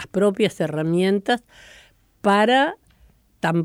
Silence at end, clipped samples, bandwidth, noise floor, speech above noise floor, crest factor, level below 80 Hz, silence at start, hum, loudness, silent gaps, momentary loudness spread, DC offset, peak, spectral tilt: 0 s; under 0.1%; 15.5 kHz; -56 dBFS; 36 dB; 16 dB; -60 dBFS; 0 s; none; -20 LUFS; none; 9 LU; under 0.1%; -6 dBFS; -6 dB/octave